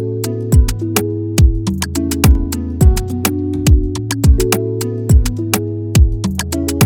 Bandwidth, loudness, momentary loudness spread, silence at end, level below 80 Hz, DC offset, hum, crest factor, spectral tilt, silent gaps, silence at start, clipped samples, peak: 19 kHz; -15 LUFS; 6 LU; 0 s; -16 dBFS; under 0.1%; none; 14 dB; -5.5 dB/octave; none; 0 s; under 0.1%; 0 dBFS